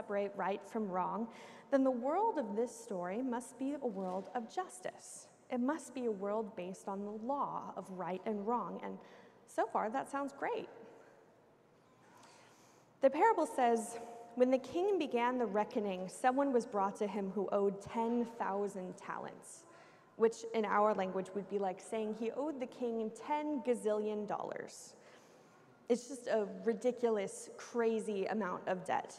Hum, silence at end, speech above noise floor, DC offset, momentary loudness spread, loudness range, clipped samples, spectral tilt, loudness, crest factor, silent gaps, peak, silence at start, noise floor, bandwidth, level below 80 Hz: none; 0 s; 30 dB; under 0.1%; 13 LU; 6 LU; under 0.1%; -5.5 dB/octave; -37 LUFS; 20 dB; none; -18 dBFS; 0 s; -66 dBFS; 13.5 kHz; -84 dBFS